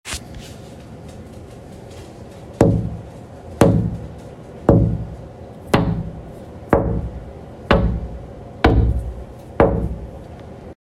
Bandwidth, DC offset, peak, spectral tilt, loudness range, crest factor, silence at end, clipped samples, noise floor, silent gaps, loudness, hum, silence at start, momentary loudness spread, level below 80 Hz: 13.5 kHz; under 0.1%; 0 dBFS; -7 dB/octave; 2 LU; 20 dB; 0.1 s; under 0.1%; -37 dBFS; none; -19 LUFS; none; 0.05 s; 21 LU; -28 dBFS